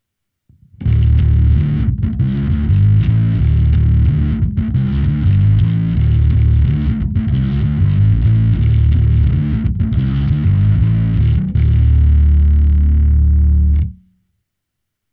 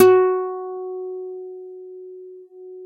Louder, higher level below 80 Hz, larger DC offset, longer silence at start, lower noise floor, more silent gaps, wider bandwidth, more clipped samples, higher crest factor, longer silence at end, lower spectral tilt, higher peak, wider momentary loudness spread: first, -14 LUFS vs -22 LUFS; first, -16 dBFS vs -76 dBFS; neither; first, 0.8 s vs 0 s; first, -76 dBFS vs -40 dBFS; neither; second, 3.9 kHz vs 14 kHz; neither; second, 10 dB vs 22 dB; first, 1.2 s vs 0 s; first, -11.5 dB/octave vs -5.5 dB/octave; about the same, -2 dBFS vs 0 dBFS; second, 5 LU vs 23 LU